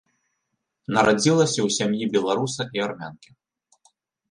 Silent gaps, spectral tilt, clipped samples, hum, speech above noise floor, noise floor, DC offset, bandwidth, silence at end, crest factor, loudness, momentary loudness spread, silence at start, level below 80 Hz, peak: none; -4.5 dB/octave; under 0.1%; none; 56 dB; -78 dBFS; under 0.1%; 11.5 kHz; 1.15 s; 20 dB; -22 LUFS; 15 LU; 0.9 s; -62 dBFS; -4 dBFS